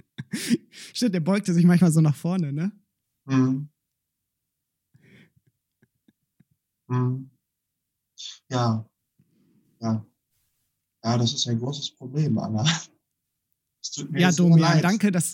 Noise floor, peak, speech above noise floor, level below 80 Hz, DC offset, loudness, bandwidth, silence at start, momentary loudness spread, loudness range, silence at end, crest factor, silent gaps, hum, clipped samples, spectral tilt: -82 dBFS; -6 dBFS; 60 dB; -74 dBFS; under 0.1%; -23 LUFS; 16.5 kHz; 0.2 s; 16 LU; 12 LU; 0 s; 20 dB; none; none; under 0.1%; -5.5 dB/octave